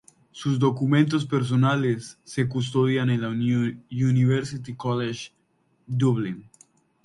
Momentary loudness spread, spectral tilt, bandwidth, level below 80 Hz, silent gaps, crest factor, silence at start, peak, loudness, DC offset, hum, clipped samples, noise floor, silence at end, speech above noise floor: 11 LU; -7 dB/octave; 11.5 kHz; -62 dBFS; none; 18 dB; 0.35 s; -8 dBFS; -24 LUFS; under 0.1%; none; under 0.1%; -65 dBFS; 0.65 s; 42 dB